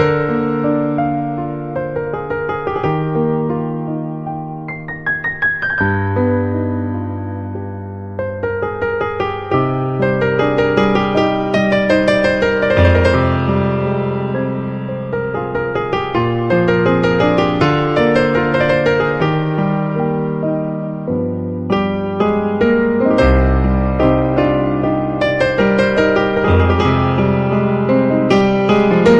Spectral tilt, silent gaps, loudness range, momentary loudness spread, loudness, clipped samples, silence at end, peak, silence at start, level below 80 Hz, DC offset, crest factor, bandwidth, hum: -8 dB/octave; none; 6 LU; 9 LU; -16 LUFS; under 0.1%; 0 s; 0 dBFS; 0 s; -30 dBFS; under 0.1%; 14 dB; 9 kHz; none